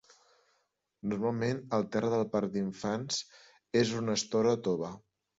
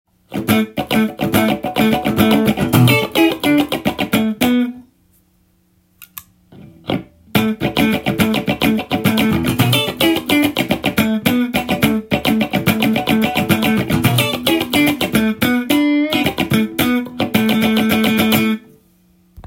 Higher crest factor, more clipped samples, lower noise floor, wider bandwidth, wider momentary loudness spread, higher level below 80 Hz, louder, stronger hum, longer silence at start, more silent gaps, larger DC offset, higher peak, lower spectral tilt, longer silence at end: about the same, 18 dB vs 16 dB; neither; first, -78 dBFS vs -57 dBFS; second, 8 kHz vs 17 kHz; first, 8 LU vs 5 LU; second, -68 dBFS vs -44 dBFS; second, -32 LUFS vs -16 LUFS; neither; first, 1.05 s vs 0.3 s; neither; neither; second, -16 dBFS vs 0 dBFS; about the same, -5 dB/octave vs -5 dB/octave; first, 0.4 s vs 0.05 s